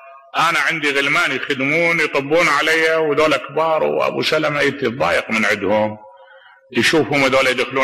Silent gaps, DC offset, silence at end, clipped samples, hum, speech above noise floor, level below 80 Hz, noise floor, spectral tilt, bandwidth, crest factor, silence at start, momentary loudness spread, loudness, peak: none; under 0.1%; 0 s; under 0.1%; none; 29 dB; -54 dBFS; -46 dBFS; -4 dB/octave; 13.5 kHz; 12 dB; 0 s; 4 LU; -16 LUFS; -6 dBFS